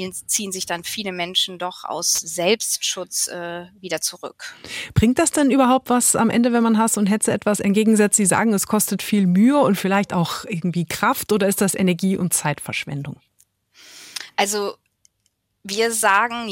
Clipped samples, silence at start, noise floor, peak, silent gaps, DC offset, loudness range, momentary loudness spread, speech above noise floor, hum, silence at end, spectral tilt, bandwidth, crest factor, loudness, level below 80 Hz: under 0.1%; 0 s; -70 dBFS; -4 dBFS; none; under 0.1%; 6 LU; 13 LU; 50 dB; none; 0 s; -3.5 dB/octave; 17 kHz; 18 dB; -19 LUFS; -50 dBFS